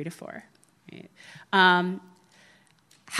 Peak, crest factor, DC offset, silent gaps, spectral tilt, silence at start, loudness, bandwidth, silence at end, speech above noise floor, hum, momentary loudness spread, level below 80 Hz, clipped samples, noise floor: -4 dBFS; 24 dB; under 0.1%; none; -4 dB/octave; 0 s; -22 LUFS; 13 kHz; 0 s; 35 dB; none; 27 LU; -80 dBFS; under 0.1%; -61 dBFS